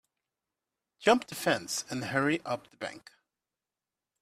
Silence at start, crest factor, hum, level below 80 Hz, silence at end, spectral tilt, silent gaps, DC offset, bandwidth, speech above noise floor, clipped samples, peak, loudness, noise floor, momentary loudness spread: 1 s; 24 dB; none; -72 dBFS; 1.2 s; -3.5 dB/octave; none; under 0.1%; 15.5 kHz; over 60 dB; under 0.1%; -10 dBFS; -30 LUFS; under -90 dBFS; 14 LU